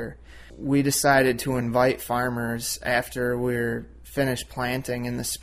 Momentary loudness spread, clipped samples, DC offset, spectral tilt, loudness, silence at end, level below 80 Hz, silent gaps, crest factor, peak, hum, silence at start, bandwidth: 10 LU; under 0.1%; under 0.1%; -4.5 dB/octave; -25 LUFS; 0 s; -48 dBFS; none; 20 dB; -6 dBFS; none; 0 s; 16 kHz